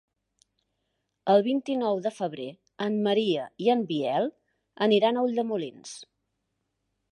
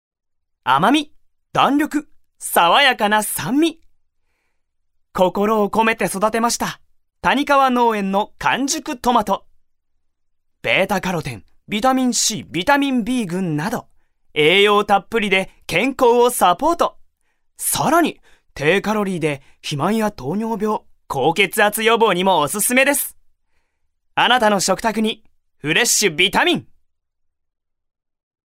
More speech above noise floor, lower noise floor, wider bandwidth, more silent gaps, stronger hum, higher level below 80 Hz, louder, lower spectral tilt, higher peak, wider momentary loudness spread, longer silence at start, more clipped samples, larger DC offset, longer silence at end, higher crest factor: about the same, 54 dB vs 52 dB; first, -79 dBFS vs -69 dBFS; second, 11.5 kHz vs 16 kHz; neither; neither; second, -80 dBFS vs -50 dBFS; second, -26 LUFS vs -17 LUFS; first, -5.5 dB/octave vs -3 dB/octave; second, -8 dBFS vs -2 dBFS; first, 15 LU vs 11 LU; first, 1.25 s vs 0.65 s; neither; neither; second, 1.1 s vs 1.95 s; about the same, 20 dB vs 18 dB